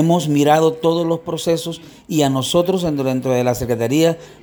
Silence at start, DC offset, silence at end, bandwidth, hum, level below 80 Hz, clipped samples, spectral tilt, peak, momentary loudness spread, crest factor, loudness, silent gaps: 0 s; under 0.1%; 0.1 s; over 20 kHz; none; -48 dBFS; under 0.1%; -5.5 dB/octave; -2 dBFS; 7 LU; 14 dB; -17 LUFS; none